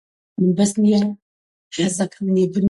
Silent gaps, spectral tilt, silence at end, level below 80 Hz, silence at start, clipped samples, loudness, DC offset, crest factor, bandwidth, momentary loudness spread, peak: 1.22-1.71 s; -6 dB/octave; 0 s; -58 dBFS; 0.4 s; under 0.1%; -19 LUFS; under 0.1%; 12 dB; 11.5 kHz; 15 LU; -6 dBFS